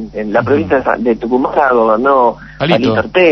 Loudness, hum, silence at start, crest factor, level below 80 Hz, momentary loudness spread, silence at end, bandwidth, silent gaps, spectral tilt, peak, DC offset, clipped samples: -12 LUFS; none; 0 s; 12 dB; -40 dBFS; 5 LU; 0 s; 6.2 kHz; none; -7.5 dB/octave; 0 dBFS; under 0.1%; under 0.1%